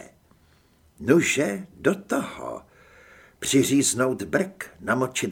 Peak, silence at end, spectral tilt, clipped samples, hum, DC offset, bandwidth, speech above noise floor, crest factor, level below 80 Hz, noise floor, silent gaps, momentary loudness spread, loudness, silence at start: -4 dBFS; 0 s; -4 dB/octave; under 0.1%; none; under 0.1%; 18 kHz; 36 dB; 22 dB; -58 dBFS; -59 dBFS; none; 14 LU; -24 LUFS; 0 s